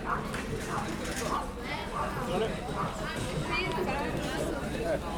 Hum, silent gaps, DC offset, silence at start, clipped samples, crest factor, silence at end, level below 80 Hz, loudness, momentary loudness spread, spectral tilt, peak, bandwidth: none; none; under 0.1%; 0 s; under 0.1%; 14 dB; 0 s; -44 dBFS; -33 LUFS; 4 LU; -5 dB/octave; -18 dBFS; over 20 kHz